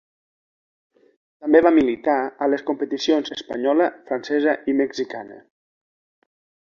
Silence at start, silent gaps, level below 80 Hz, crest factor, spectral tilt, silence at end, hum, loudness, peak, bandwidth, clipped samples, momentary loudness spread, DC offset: 1.4 s; none; -62 dBFS; 20 dB; -4.5 dB/octave; 1.3 s; none; -21 LUFS; -2 dBFS; 7.2 kHz; under 0.1%; 13 LU; under 0.1%